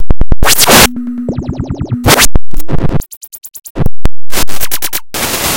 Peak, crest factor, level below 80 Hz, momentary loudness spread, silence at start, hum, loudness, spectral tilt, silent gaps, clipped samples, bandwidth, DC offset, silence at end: 0 dBFS; 6 dB; -18 dBFS; 17 LU; 0 s; none; -11 LUFS; -3 dB/octave; 3.17-3.21 s, 3.70-3.75 s; 20%; over 20 kHz; under 0.1%; 0 s